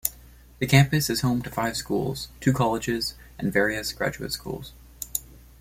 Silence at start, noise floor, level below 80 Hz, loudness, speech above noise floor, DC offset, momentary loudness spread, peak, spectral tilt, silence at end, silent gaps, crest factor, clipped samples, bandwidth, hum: 0.05 s; -49 dBFS; -48 dBFS; -25 LUFS; 25 dB; under 0.1%; 12 LU; -4 dBFS; -5 dB/octave; 0.25 s; none; 22 dB; under 0.1%; 16.5 kHz; none